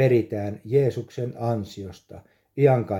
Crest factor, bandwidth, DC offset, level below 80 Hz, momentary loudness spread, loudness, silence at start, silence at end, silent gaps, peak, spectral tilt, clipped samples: 18 dB; 13.5 kHz; under 0.1%; -62 dBFS; 18 LU; -24 LUFS; 0 s; 0 s; none; -6 dBFS; -8.5 dB/octave; under 0.1%